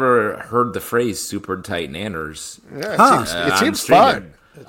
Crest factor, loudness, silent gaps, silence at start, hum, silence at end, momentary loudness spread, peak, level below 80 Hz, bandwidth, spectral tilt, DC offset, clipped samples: 16 dB; -17 LUFS; none; 0 s; none; 0.05 s; 15 LU; -2 dBFS; -50 dBFS; 17 kHz; -4 dB/octave; under 0.1%; under 0.1%